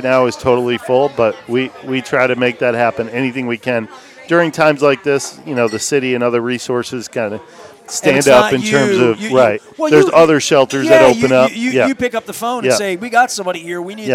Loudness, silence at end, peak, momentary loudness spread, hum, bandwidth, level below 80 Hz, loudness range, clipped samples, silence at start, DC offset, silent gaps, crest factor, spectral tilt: -14 LUFS; 0 s; 0 dBFS; 11 LU; none; 16 kHz; -52 dBFS; 5 LU; under 0.1%; 0 s; under 0.1%; none; 14 dB; -4.5 dB/octave